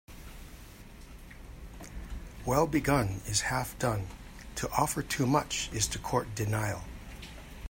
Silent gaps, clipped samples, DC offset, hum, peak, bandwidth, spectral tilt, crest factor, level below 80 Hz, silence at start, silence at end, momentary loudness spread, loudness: none; under 0.1%; under 0.1%; none; -10 dBFS; 16.5 kHz; -4 dB/octave; 22 dB; -46 dBFS; 0.1 s; 0.05 s; 22 LU; -31 LUFS